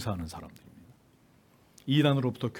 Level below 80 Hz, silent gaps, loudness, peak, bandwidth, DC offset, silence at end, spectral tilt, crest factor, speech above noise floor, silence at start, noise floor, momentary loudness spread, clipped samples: -60 dBFS; none; -28 LUFS; -12 dBFS; 16 kHz; under 0.1%; 0 s; -7 dB/octave; 20 dB; 33 dB; 0 s; -62 dBFS; 21 LU; under 0.1%